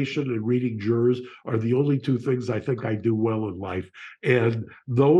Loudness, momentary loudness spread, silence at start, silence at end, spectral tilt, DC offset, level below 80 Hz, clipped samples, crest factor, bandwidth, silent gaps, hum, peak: -25 LUFS; 9 LU; 0 s; 0 s; -8.5 dB/octave; under 0.1%; -64 dBFS; under 0.1%; 16 dB; 8 kHz; none; none; -6 dBFS